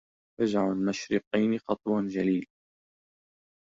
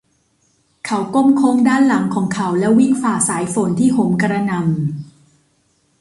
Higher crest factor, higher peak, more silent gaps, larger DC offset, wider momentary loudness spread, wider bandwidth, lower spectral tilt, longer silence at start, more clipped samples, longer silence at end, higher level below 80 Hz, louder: about the same, 18 dB vs 14 dB; second, -12 dBFS vs -4 dBFS; first, 1.27-1.31 s vs none; neither; second, 4 LU vs 9 LU; second, 7.8 kHz vs 11.5 kHz; about the same, -6.5 dB/octave vs -6 dB/octave; second, 0.4 s vs 0.85 s; neither; first, 1.25 s vs 0.95 s; second, -66 dBFS vs -56 dBFS; second, -29 LUFS vs -16 LUFS